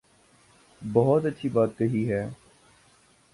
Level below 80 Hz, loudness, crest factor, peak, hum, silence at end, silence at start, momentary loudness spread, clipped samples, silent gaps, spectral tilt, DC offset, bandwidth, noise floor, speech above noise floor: -60 dBFS; -25 LUFS; 20 dB; -6 dBFS; none; 1 s; 0.8 s; 11 LU; under 0.1%; none; -8.5 dB/octave; under 0.1%; 11.5 kHz; -60 dBFS; 36 dB